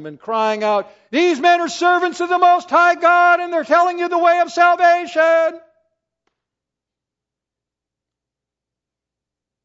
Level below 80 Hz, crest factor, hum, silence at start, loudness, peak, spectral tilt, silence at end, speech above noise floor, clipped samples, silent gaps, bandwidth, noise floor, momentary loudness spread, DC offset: -74 dBFS; 16 dB; none; 0 s; -15 LUFS; -2 dBFS; -3 dB/octave; 4.05 s; 70 dB; under 0.1%; none; 8 kHz; -85 dBFS; 7 LU; under 0.1%